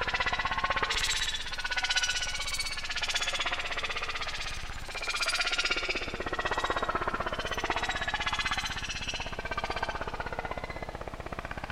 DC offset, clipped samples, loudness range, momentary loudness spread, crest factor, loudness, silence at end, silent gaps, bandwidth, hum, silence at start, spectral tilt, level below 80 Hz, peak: under 0.1%; under 0.1%; 4 LU; 10 LU; 18 dB; -31 LUFS; 0 s; none; 16 kHz; none; 0 s; -1.5 dB/octave; -42 dBFS; -14 dBFS